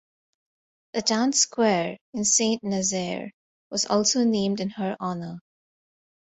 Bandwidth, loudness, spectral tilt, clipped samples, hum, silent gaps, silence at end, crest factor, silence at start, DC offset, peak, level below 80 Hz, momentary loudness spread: 8.2 kHz; -24 LUFS; -3 dB/octave; under 0.1%; none; 2.01-2.13 s, 3.34-3.71 s; 0.9 s; 18 dB; 0.95 s; under 0.1%; -8 dBFS; -66 dBFS; 13 LU